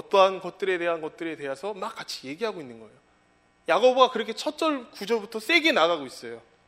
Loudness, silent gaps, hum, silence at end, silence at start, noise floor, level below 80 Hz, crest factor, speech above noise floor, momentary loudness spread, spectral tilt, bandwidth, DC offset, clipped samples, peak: -25 LUFS; none; none; 0.3 s; 0.1 s; -63 dBFS; -74 dBFS; 22 dB; 38 dB; 16 LU; -3 dB/octave; 16 kHz; under 0.1%; under 0.1%; -4 dBFS